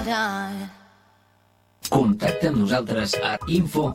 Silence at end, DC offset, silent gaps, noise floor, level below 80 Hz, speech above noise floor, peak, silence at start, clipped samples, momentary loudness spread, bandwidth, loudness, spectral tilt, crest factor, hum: 0 s; under 0.1%; none; -61 dBFS; -48 dBFS; 38 dB; -6 dBFS; 0 s; under 0.1%; 12 LU; 16.5 kHz; -23 LUFS; -5.5 dB/octave; 18 dB; 50 Hz at -45 dBFS